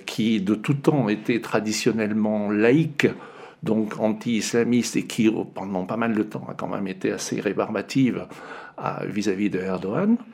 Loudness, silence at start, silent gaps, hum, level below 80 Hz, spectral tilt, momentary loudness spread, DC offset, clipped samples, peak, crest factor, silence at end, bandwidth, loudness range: -24 LUFS; 0 s; none; none; -68 dBFS; -5.5 dB/octave; 9 LU; under 0.1%; under 0.1%; -2 dBFS; 20 dB; 0 s; 15.5 kHz; 4 LU